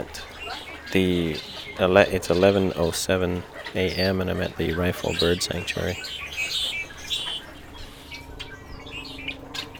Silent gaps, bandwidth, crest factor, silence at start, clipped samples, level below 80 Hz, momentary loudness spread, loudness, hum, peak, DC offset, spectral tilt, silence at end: none; over 20 kHz; 24 dB; 0 s; under 0.1%; -46 dBFS; 19 LU; -25 LUFS; none; -2 dBFS; under 0.1%; -4.5 dB/octave; 0 s